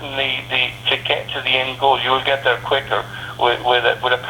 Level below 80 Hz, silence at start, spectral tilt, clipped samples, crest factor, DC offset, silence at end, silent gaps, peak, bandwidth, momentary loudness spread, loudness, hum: -48 dBFS; 0 s; -4 dB/octave; under 0.1%; 18 dB; under 0.1%; 0 s; none; -2 dBFS; 18 kHz; 4 LU; -18 LUFS; none